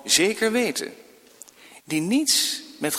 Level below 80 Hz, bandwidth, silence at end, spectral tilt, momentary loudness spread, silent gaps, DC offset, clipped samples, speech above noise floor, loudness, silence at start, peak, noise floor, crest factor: -68 dBFS; 17 kHz; 0 s; -2 dB/octave; 11 LU; none; under 0.1%; under 0.1%; 27 dB; -22 LUFS; 0.05 s; -6 dBFS; -49 dBFS; 20 dB